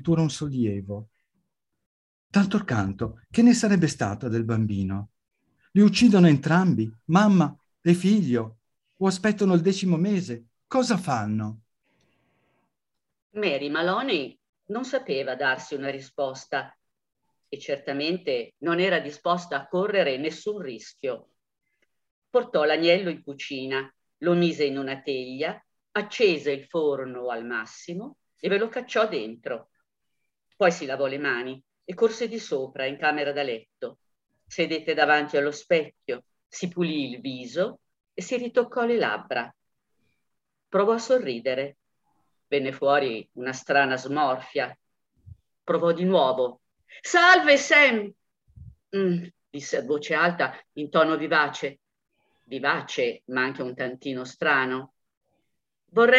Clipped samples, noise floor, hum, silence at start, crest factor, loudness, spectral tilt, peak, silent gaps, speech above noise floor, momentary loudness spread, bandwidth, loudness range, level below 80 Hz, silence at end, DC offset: under 0.1%; -85 dBFS; none; 0 s; 22 dB; -24 LUFS; -5.5 dB/octave; -4 dBFS; 1.86-2.30 s, 13.22-13.30 s, 14.49-14.53 s, 22.11-22.22 s, 36.46-36.50 s, 55.17-55.21 s; 61 dB; 15 LU; 11.5 kHz; 8 LU; -64 dBFS; 0 s; under 0.1%